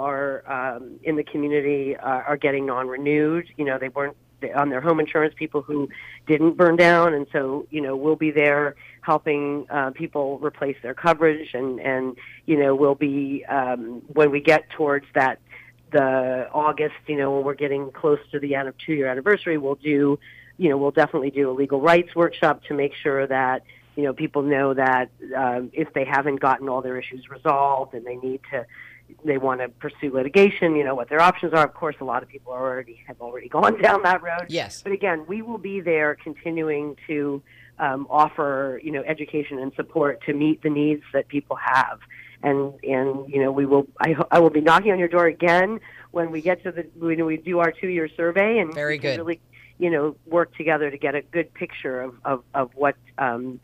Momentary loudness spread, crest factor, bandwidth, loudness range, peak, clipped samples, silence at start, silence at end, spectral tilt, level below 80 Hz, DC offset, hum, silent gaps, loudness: 11 LU; 16 dB; 11.5 kHz; 5 LU; -6 dBFS; under 0.1%; 0 s; 0.05 s; -7 dB/octave; -62 dBFS; under 0.1%; none; none; -22 LUFS